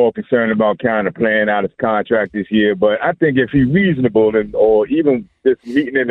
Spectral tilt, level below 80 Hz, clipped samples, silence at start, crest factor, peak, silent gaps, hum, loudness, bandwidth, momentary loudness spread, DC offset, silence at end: -9 dB/octave; -46 dBFS; under 0.1%; 0 s; 12 dB; -2 dBFS; none; none; -15 LUFS; 4.7 kHz; 4 LU; under 0.1%; 0 s